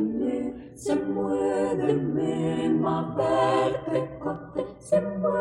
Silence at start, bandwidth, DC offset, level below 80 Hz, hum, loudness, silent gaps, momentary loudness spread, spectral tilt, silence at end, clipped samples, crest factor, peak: 0 s; 12 kHz; under 0.1%; -56 dBFS; none; -26 LUFS; none; 9 LU; -7 dB/octave; 0 s; under 0.1%; 16 dB; -10 dBFS